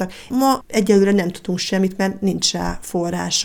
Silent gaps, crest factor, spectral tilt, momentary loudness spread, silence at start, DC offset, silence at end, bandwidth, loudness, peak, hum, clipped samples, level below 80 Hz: none; 18 dB; -4.5 dB/octave; 9 LU; 0 s; under 0.1%; 0 s; 19 kHz; -19 LUFS; -2 dBFS; none; under 0.1%; -42 dBFS